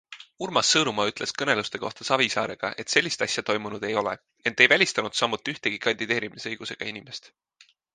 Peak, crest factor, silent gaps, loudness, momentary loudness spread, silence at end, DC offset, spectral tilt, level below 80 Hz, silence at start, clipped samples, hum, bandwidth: -2 dBFS; 26 dB; none; -24 LUFS; 13 LU; 0.7 s; under 0.1%; -2 dB/octave; -66 dBFS; 0.1 s; under 0.1%; none; 10 kHz